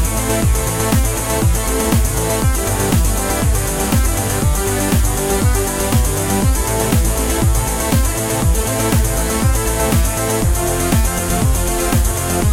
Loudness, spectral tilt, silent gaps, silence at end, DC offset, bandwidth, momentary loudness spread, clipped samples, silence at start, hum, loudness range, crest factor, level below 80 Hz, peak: -16 LUFS; -4.5 dB/octave; none; 0 s; under 0.1%; 16.5 kHz; 1 LU; under 0.1%; 0 s; none; 0 LU; 14 dB; -20 dBFS; -2 dBFS